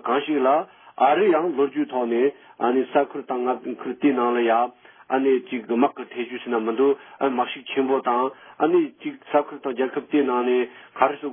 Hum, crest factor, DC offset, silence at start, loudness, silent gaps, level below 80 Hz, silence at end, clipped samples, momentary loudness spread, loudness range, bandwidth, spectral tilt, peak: none; 20 dB; under 0.1%; 0.05 s; -23 LUFS; none; -84 dBFS; 0 s; under 0.1%; 8 LU; 2 LU; 3.6 kHz; -9.5 dB/octave; -4 dBFS